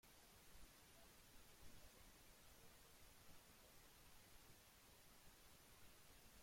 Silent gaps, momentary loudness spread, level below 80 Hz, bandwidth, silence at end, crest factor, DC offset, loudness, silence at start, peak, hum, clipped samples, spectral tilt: none; 1 LU; -74 dBFS; 16.5 kHz; 0 s; 16 dB; under 0.1%; -67 LUFS; 0.05 s; -50 dBFS; none; under 0.1%; -2.5 dB/octave